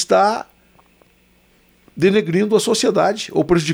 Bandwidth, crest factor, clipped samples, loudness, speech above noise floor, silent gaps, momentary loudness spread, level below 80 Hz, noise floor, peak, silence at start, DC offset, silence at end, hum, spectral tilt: over 20 kHz; 14 dB; under 0.1%; -17 LUFS; 40 dB; none; 3 LU; -50 dBFS; -55 dBFS; -4 dBFS; 0 s; under 0.1%; 0 s; none; -5 dB/octave